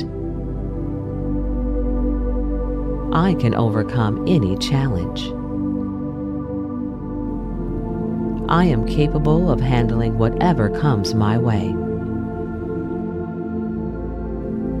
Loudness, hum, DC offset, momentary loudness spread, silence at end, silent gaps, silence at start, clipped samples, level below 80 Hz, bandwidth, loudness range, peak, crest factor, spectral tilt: -21 LUFS; none; under 0.1%; 9 LU; 0 s; none; 0 s; under 0.1%; -28 dBFS; 11.5 kHz; 6 LU; -4 dBFS; 16 dB; -8 dB/octave